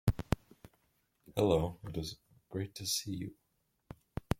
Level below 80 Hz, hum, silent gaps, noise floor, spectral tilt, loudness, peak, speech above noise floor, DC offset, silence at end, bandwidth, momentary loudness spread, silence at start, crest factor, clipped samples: -50 dBFS; none; none; -79 dBFS; -5 dB/octave; -37 LUFS; -14 dBFS; 44 dB; under 0.1%; 0.05 s; 16.5 kHz; 17 LU; 0.05 s; 24 dB; under 0.1%